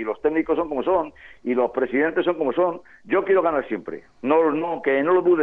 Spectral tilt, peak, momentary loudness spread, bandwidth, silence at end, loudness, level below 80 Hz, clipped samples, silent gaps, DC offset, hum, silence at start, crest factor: -8.5 dB/octave; -6 dBFS; 12 LU; 4 kHz; 0 s; -22 LUFS; -56 dBFS; under 0.1%; none; under 0.1%; none; 0 s; 14 dB